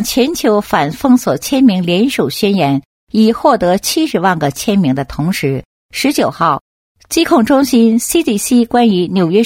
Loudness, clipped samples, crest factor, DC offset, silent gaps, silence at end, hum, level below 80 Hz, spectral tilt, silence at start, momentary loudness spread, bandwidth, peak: -13 LUFS; under 0.1%; 12 dB; under 0.1%; 2.85-3.07 s, 5.65-5.89 s, 6.61-6.95 s; 0 s; none; -44 dBFS; -5 dB/octave; 0 s; 7 LU; 16.5 kHz; 0 dBFS